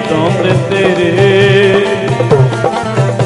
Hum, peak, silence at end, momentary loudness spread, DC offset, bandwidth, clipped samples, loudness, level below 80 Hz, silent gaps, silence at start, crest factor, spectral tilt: none; 0 dBFS; 0 s; 6 LU; under 0.1%; 11.5 kHz; under 0.1%; -10 LUFS; -42 dBFS; none; 0 s; 10 dB; -6.5 dB/octave